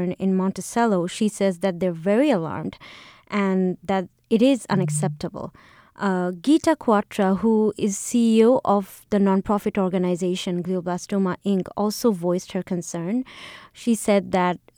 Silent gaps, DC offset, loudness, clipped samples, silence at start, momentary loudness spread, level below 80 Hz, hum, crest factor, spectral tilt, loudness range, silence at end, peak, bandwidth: none; under 0.1%; -22 LUFS; under 0.1%; 0 s; 9 LU; -58 dBFS; none; 16 dB; -6 dB/octave; 4 LU; 0.2 s; -6 dBFS; 18.5 kHz